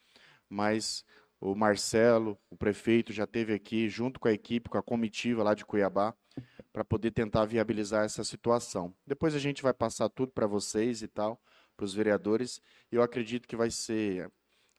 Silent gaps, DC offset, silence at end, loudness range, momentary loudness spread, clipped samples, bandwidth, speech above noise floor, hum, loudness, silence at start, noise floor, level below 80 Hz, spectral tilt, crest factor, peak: none; under 0.1%; 0.5 s; 3 LU; 10 LU; under 0.1%; 13 kHz; 31 dB; none; -31 LUFS; 0.5 s; -62 dBFS; -60 dBFS; -5 dB/octave; 20 dB; -10 dBFS